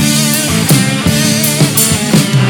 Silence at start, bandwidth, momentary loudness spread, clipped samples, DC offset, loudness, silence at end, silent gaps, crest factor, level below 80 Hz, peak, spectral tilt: 0 s; over 20 kHz; 2 LU; 0.1%; under 0.1%; -10 LUFS; 0 s; none; 10 dB; -36 dBFS; 0 dBFS; -4 dB/octave